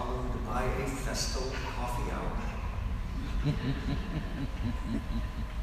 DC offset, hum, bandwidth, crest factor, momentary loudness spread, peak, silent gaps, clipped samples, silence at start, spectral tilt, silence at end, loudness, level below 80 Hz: under 0.1%; none; 15.5 kHz; 14 dB; 5 LU; -18 dBFS; none; under 0.1%; 0 s; -5.5 dB/octave; 0 s; -35 LUFS; -36 dBFS